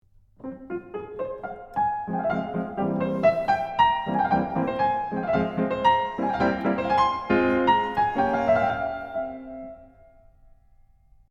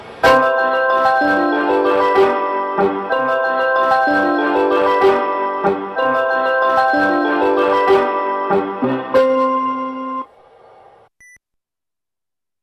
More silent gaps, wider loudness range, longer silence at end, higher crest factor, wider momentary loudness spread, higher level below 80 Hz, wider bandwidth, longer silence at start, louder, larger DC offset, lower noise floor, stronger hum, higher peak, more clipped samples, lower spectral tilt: neither; about the same, 5 LU vs 5 LU; second, 1.45 s vs 2.4 s; about the same, 16 dB vs 14 dB; first, 14 LU vs 6 LU; about the same, -52 dBFS vs -54 dBFS; second, 8 kHz vs 13.5 kHz; first, 0.4 s vs 0 s; second, -24 LUFS vs -15 LUFS; neither; second, -56 dBFS vs -90 dBFS; neither; second, -8 dBFS vs -2 dBFS; neither; first, -7 dB/octave vs -5.5 dB/octave